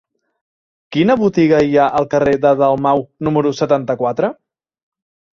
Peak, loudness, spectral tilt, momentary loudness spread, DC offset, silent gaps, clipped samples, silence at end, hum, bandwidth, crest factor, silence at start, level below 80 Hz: 0 dBFS; -15 LUFS; -7 dB/octave; 6 LU; under 0.1%; none; under 0.1%; 1.05 s; none; 7.4 kHz; 16 dB; 0.9 s; -50 dBFS